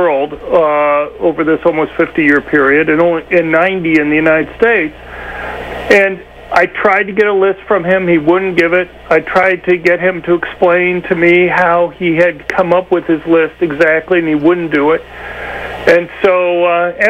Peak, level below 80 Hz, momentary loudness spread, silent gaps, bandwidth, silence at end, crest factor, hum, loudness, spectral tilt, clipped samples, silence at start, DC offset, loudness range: 0 dBFS; -40 dBFS; 6 LU; none; 9 kHz; 0 s; 12 dB; 60 Hz at -40 dBFS; -11 LUFS; -7 dB/octave; under 0.1%; 0 s; under 0.1%; 2 LU